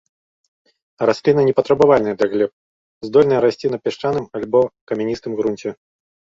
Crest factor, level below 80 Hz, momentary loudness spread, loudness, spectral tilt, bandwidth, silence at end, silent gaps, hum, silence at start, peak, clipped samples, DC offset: 16 dB; -56 dBFS; 10 LU; -18 LUFS; -7 dB/octave; 7.6 kHz; 0.65 s; 2.53-3.01 s, 4.81-4.87 s; none; 1 s; -2 dBFS; under 0.1%; under 0.1%